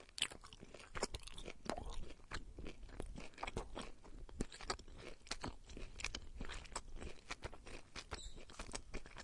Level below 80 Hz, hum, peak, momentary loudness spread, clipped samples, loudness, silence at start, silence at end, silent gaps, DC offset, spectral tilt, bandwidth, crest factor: -54 dBFS; none; -20 dBFS; 10 LU; under 0.1%; -50 LUFS; 0 s; 0 s; none; under 0.1%; -3 dB/octave; 11.5 kHz; 28 dB